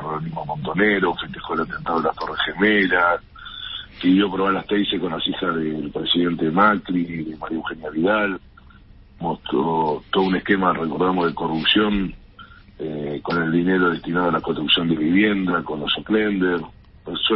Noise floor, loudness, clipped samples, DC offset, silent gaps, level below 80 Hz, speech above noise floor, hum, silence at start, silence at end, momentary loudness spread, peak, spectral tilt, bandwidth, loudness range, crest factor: -46 dBFS; -21 LUFS; under 0.1%; under 0.1%; none; -46 dBFS; 26 dB; none; 0 s; 0 s; 11 LU; -4 dBFS; -10.5 dB/octave; 5.8 kHz; 2 LU; 18 dB